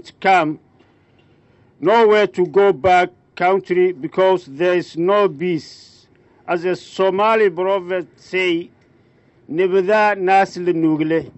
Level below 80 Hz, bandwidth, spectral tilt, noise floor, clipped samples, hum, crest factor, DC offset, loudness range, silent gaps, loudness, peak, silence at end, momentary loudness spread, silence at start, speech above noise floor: -60 dBFS; 8.2 kHz; -6 dB/octave; -54 dBFS; under 0.1%; none; 14 dB; under 0.1%; 4 LU; none; -17 LUFS; -4 dBFS; 0.1 s; 10 LU; 0.05 s; 37 dB